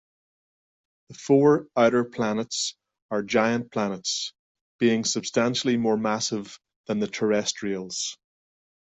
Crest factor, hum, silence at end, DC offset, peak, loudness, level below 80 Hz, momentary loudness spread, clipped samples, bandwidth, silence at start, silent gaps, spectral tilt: 18 dB; none; 0.65 s; under 0.1%; -8 dBFS; -25 LUFS; -66 dBFS; 10 LU; under 0.1%; 8.4 kHz; 1.1 s; 3.02-3.09 s, 4.39-4.55 s, 4.61-4.79 s, 6.76-6.84 s; -4 dB/octave